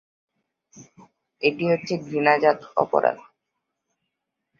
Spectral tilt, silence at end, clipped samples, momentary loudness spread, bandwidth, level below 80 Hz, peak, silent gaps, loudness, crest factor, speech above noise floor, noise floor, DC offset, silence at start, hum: -6 dB/octave; 1.4 s; under 0.1%; 7 LU; 7.2 kHz; -70 dBFS; -4 dBFS; none; -22 LUFS; 22 dB; 59 dB; -81 dBFS; under 0.1%; 0.75 s; none